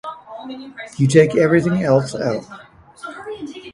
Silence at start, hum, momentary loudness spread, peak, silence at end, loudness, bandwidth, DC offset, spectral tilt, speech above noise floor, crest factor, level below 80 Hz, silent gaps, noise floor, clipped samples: 0.05 s; none; 20 LU; 0 dBFS; 0.05 s; -16 LUFS; 11.5 kHz; under 0.1%; -6.5 dB/octave; 19 dB; 18 dB; -54 dBFS; none; -36 dBFS; under 0.1%